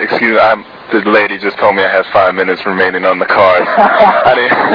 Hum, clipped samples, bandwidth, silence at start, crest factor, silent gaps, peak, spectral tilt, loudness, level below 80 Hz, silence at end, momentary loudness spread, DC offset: none; 0.9%; 5.4 kHz; 0 s; 10 dB; none; 0 dBFS; -6.5 dB/octave; -10 LUFS; -50 dBFS; 0 s; 6 LU; under 0.1%